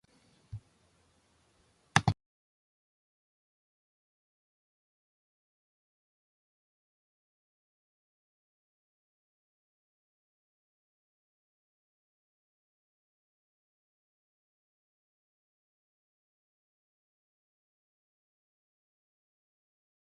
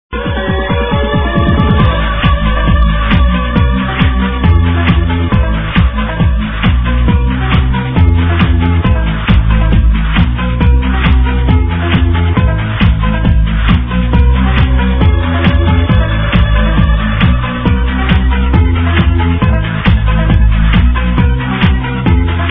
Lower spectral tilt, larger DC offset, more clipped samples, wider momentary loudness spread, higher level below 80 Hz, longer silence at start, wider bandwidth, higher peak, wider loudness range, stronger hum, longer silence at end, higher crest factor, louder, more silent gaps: second, -4 dB/octave vs -10 dB/octave; neither; second, under 0.1% vs 0.4%; first, 21 LU vs 3 LU; second, -64 dBFS vs -12 dBFS; first, 0.55 s vs 0.1 s; first, 11 kHz vs 4 kHz; second, -4 dBFS vs 0 dBFS; about the same, 0 LU vs 1 LU; neither; first, 17.85 s vs 0 s; first, 42 dB vs 10 dB; second, -31 LUFS vs -11 LUFS; neither